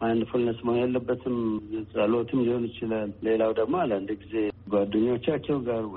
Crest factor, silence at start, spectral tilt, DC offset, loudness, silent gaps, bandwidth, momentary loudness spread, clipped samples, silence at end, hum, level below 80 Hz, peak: 14 dB; 0 s; -6 dB/octave; under 0.1%; -27 LUFS; none; 4.2 kHz; 5 LU; under 0.1%; 0 s; none; -56 dBFS; -12 dBFS